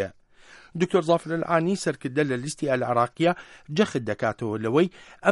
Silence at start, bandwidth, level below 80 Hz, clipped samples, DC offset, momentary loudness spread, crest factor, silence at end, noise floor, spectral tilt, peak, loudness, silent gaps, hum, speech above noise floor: 0 s; 11.5 kHz; -62 dBFS; under 0.1%; under 0.1%; 6 LU; 20 dB; 0 s; -52 dBFS; -6 dB/octave; -6 dBFS; -25 LUFS; none; none; 27 dB